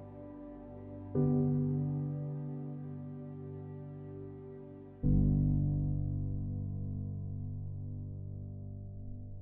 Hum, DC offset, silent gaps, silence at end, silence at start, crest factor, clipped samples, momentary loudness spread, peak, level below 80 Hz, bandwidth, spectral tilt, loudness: 50 Hz at -55 dBFS; under 0.1%; none; 0 s; 0 s; 18 dB; under 0.1%; 18 LU; -18 dBFS; -46 dBFS; 2.1 kHz; -14.5 dB/octave; -36 LUFS